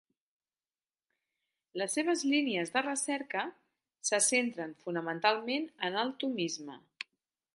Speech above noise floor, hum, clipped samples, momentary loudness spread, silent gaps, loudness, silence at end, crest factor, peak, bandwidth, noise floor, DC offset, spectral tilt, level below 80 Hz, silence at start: over 57 dB; none; under 0.1%; 15 LU; none; -32 LUFS; 0.8 s; 22 dB; -14 dBFS; 11.5 kHz; under -90 dBFS; under 0.1%; -2 dB/octave; -88 dBFS; 1.75 s